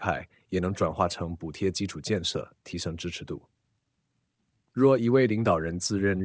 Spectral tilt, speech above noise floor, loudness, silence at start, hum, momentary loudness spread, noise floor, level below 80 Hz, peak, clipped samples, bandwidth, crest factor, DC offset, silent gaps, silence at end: -5.5 dB/octave; 50 dB; -28 LUFS; 0 s; none; 14 LU; -77 dBFS; -48 dBFS; -8 dBFS; under 0.1%; 8 kHz; 20 dB; under 0.1%; none; 0 s